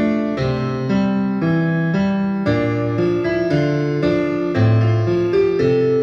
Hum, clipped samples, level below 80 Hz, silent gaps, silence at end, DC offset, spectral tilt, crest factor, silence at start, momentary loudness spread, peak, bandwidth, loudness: none; under 0.1%; -44 dBFS; none; 0 s; under 0.1%; -8.5 dB/octave; 12 dB; 0 s; 4 LU; -4 dBFS; 7 kHz; -18 LUFS